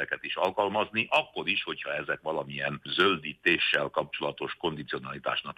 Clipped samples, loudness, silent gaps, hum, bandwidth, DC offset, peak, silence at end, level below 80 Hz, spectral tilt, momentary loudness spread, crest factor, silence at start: under 0.1%; -29 LUFS; none; none; 15.5 kHz; under 0.1%; -10 dBFS; 0.05 s; -66 dBFS; -5 dB/octave; 8 LU; 20 dB; 0 s